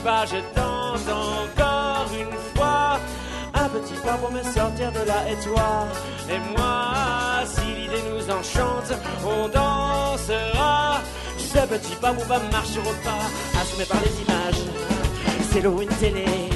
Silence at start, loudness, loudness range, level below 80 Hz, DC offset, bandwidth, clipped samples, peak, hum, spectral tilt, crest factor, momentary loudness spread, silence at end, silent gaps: 0 s; -24 LUFS; 2 LU; -32 dBFS; under 0.1%; 12 kHz; under 0.1%; -6 dBFS; none; -4.5 dB/octave; 18 dB; 5 LU; 0 s; none